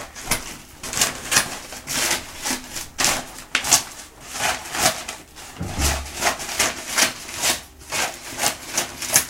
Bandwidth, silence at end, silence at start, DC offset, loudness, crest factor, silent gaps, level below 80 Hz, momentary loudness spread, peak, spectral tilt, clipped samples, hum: 17 kHz; 0 s; 0 s; under 0.1%; -22 LUFS; 24 dB; none; -40 dBFS; 14 LU; 0 dBFS; -1 dB/octave; under 0.1%; none